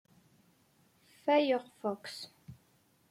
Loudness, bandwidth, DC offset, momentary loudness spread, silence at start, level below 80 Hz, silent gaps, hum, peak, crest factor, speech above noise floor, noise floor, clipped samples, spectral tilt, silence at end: -33 LUFS; 15.5 kHz; under 0.1%; 24 LU; 1.25 s; -80 dBFS; none; none; -16 dBFS; 20 dB; 38 dB; -69 dBFS; under 0.1%; -5 dB/octave; 0.55 s